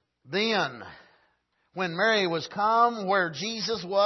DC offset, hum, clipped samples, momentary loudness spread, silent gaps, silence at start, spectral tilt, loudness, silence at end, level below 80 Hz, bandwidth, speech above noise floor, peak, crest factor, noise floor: under 0.1%; none; under 0.1%; 10 LU; none; 0.25 s; -4 dB/octave; -26 LUFS; 0 s; -72 dBFS; 6.2 kHz; 45 dB; -10 dBFS; 18 dB; -71 dBFS